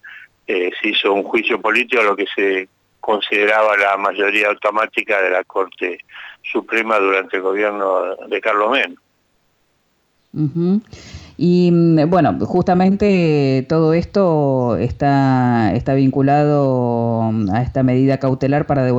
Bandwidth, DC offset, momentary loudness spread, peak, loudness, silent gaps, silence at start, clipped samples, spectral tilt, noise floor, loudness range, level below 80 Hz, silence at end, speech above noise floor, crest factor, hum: 8.6 kHz; under 0.1%; 9 LU; -4 dBFS; -16 LUFS; none; 0.05 s; under 0.1%; -7.5 dB/octave; -63 dBFS; 5 LU; -46 dBFS; 0 s; 47 dB; 12 dB; none